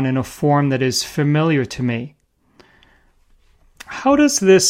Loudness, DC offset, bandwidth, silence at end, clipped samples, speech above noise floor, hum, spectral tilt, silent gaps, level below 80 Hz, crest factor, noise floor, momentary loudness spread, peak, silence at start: -17 LUFS; under 0.1%; 16 kHz; 0 s; under 0.1%; 39 dB; none; -4.5 dB/octave; none; -52 dBFS; 16 dB; -55 dBFS; 10 LU; -2 dBFS; 0 s